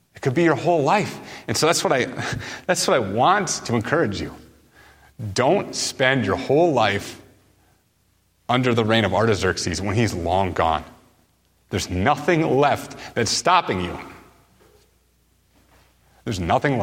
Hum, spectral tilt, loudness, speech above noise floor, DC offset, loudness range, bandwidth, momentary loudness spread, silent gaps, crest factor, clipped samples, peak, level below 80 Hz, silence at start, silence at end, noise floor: none; -4.5 dB/octave; -21 LUFS; 43 dB; under 0.1%; 2 LU; 16.5 kHz; 11 LU; none; 20 dB; under 0.1%; -2 dBFS; -48 dBFS; 0.15 s; 0 s; -64 dBFS